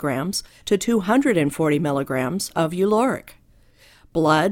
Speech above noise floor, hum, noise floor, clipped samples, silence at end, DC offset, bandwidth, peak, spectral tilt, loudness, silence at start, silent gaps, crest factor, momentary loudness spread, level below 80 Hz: 33 dB; none; -53 dBFS; under 0.1%; 0 s; under 0.1%; 17 kHz; -4 dBFS; -5.5 dB/octave; -21 LUFS; 0 s; none; 16 dB; 7 LU; -52 dBFS